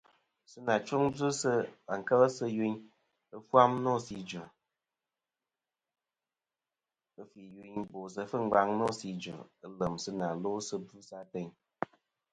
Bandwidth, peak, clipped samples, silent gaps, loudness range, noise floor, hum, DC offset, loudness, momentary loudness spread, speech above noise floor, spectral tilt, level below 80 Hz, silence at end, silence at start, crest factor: 9.6 kHz; -8 dBFS; under 0.1%; none; 17 LU; under -90 dBFS; none; under 0.1%; -32 LUFS; 20 LU; over 58 dB; -5.5 dB/octave; -70 dBFS; 0.5 s; 0.55 s; 26 dB